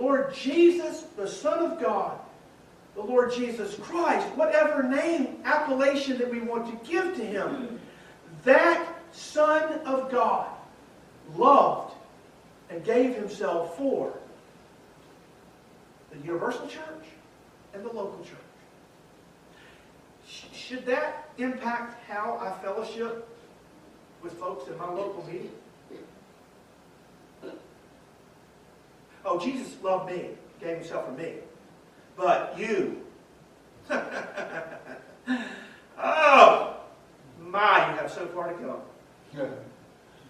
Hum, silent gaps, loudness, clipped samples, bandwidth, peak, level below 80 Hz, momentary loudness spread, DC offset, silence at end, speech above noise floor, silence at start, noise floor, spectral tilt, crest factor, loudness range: none; none; -26 LUFS; under 0.1%; 13 kHz; -2 dBFS; -70 dBFS; 22 LU; under 0.1%; 0.55 s; 29 dB; 0 s; -55 dBFS; -4.5 dB/octave; 26 dB; 16 LU